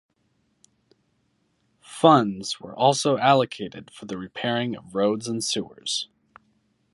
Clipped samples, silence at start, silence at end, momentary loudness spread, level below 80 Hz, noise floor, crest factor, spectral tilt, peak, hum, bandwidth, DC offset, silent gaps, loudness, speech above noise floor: under 0.1%; 1.9 s; 0.9 s; 18 LU; -66 dBFS; -69 dBFS; 24 dB; -4.5 dB/octave; -2 dBFS; none; 11.5 kHz; under 0.1%; none; -23 LUFS; 46 dB